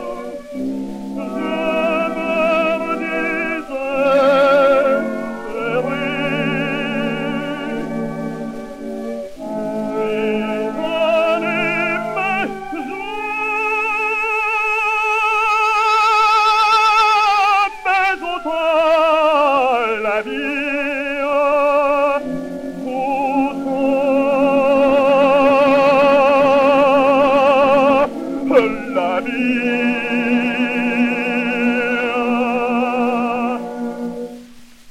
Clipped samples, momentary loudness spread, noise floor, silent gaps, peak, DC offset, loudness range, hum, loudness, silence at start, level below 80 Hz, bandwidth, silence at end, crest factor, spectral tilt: under 0.1%; 13 LU; -40 dBFS; none; 0 dBFS; under 0.1%; 8 LU; none; -16 LUFS; 0 s; -48 dBFS; 14 kHz; 0 s; 16 dB; -5 dB/octave